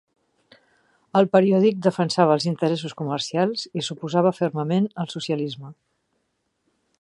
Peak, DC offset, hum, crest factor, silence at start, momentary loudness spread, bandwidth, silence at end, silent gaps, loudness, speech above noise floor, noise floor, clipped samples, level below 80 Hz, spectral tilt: -4 dBFS; under 0.1%; none; 20 dB; 1.15 s; 10 LU; 11 kHz; 1.3 s; none; -22 LUFS; 52 dB; -73 dBFS; under 0.1%; -70 dBFS; -6 dB/octave